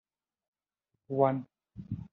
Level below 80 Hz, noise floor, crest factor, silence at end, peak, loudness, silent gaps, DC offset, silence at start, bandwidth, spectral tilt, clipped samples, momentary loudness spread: -66 dBFS; -85 dBFS; 24 dB; 0.1 s; -12 dBFS; -31 LUFS; none; under 0.1%; 1.1 s; 4.1 kHz; -9 dB/octave; under 0.1%; 22 LU